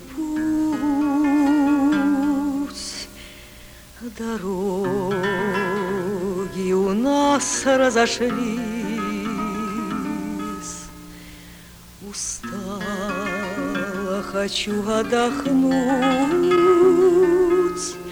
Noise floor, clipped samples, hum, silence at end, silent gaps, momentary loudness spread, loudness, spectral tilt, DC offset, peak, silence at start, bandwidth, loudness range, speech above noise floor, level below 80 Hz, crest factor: -43 dBFS; under 0.1%; none; 0 s; none; 15 LU; -21 LUFS; -4.5 dB/octave; under 0.1%; -6 dBFS; 0 s; over 20 kHz; 11 LU; 25 dB; -48 dBFS; 16 dB